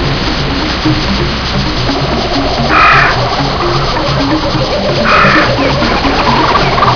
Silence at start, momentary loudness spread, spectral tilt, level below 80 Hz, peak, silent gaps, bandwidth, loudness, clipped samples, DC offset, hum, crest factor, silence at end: 0 s; 7 LU; -5 dB/octave; -20 dBFS; 0 dBFS; none; 5.4 kHz; -10 LUFS; 0.5%; 0.6%; none; 10 dB; 0 s